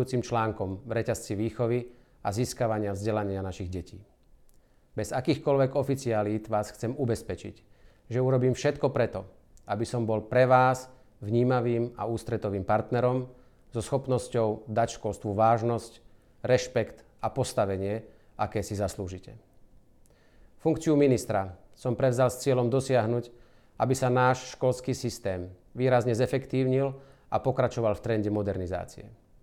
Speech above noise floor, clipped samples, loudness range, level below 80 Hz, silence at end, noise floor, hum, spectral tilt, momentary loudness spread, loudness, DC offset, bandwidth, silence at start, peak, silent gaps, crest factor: 31 dB; under 0.1%; 5 LU; -54 dBFS; 0.3 s; -59 dBFS; none; -6.5 dB/octave; 13 LU; -28 LUFS; under 0.1%; 14.5 kHz; 0 s; -8 dBFS; none; 20 dB